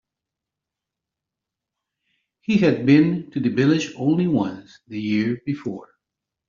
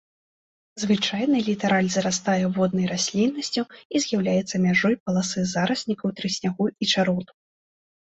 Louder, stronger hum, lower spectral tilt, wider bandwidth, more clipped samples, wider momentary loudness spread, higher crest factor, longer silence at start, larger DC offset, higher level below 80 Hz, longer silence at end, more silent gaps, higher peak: about the same, -21 LUFS vs -23 LUFS; neither; first, -6.5 dB/octave vs -4.5 dB/octave; second, 7.4 kHz vs 8.2 kHz; neither; first, 17 LU vs 6 LU; about the same, 20 dB vs 16 dB; first, 2.5 s vs 0.75 s; neither; about the same, -62 dBFS vs -62 dBFS; about the same, 0.65 s vs 0.75 s; second, none vs 3.85-3.90 s, 5.00-5.06 s; first, -4 dBFS vs -8 dBFS